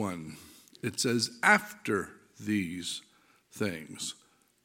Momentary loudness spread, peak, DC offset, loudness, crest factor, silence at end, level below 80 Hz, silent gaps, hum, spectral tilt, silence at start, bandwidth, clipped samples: 20 LU; -6 dBFS; under 0.1%; -31 LUFS; 26 dB; 0.5 s; -70 dBFS; none; none; -3.5 dB/octave; 0 s; 17 kHz; under 0.1%